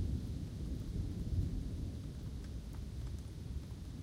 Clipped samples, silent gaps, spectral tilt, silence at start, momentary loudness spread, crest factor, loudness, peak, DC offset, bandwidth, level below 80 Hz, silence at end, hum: under 0.1%; none; -7.5 dB/octave; 0 s; 8 LU; 16 dB; -44 LUFS; -24 dBFS; under 0.1%; 16 kHz; -44 dBFS; 0 s; none